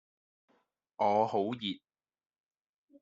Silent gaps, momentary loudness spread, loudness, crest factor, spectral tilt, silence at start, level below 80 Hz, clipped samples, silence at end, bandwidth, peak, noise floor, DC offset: none; 10 LU; -32 LUFS; 22 dB; -3.5 dB/octave; 1 s; -82 dBFS; under 0.1%; 1.25 s; 7.6 kHz; -14 dBFS; -75 dBFS; under 0.1%